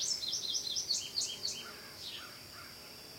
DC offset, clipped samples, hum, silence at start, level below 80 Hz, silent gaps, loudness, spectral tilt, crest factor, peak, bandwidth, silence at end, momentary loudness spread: under 0.1%; under 0.1%; none; 0 s; -72 dBFS; none; -36 LUFS; 0.5 dB/octave; 18 dB; -22 dBFS; 16.5 kHz; 0 s; 15 LU